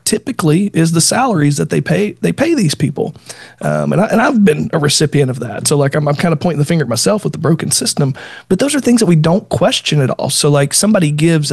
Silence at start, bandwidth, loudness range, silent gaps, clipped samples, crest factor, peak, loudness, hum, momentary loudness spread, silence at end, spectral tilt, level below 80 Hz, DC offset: 0.05 s; 12.5 kHz; 2 LU; none; under 0.1%; 12 dB; 0 dBFS; -13 LUFS; none; 6 LU; 0 s; -5 dB/octave; -50 dBFS; under 0.1%